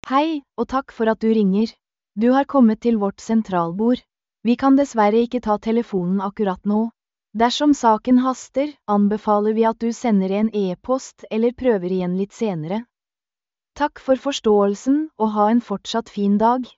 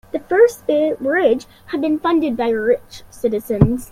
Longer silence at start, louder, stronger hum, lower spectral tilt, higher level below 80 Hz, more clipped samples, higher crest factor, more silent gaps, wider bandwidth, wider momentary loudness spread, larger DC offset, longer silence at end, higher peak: about the same, 0.05 s vs 0.15 s; about the same, -20 LUFS vs -18 LUFS; neither; second, -5.5 dB/octave vs -7 dB/octave; second, -54 dBFS vs -38 dBFS; neither; about the same, 16 dB vs 16 dB; neither; second, 8 kHz vs 16 kHz; about the same, 8 LU vs 8 LU; neither; about the same, 0.1 s vs 0.05 s; second, -4 dBFS vs 0 dBFS